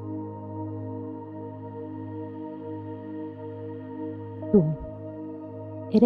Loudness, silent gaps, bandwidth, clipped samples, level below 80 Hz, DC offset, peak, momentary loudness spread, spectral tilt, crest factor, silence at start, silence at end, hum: -32 LUFS; none; 5 kHz; under 0.1%; -56 dBFS; under 0.1%; -8 dBFS; 15 LU; -11 dB/octave; 22 dB; 0 s; 0 s; none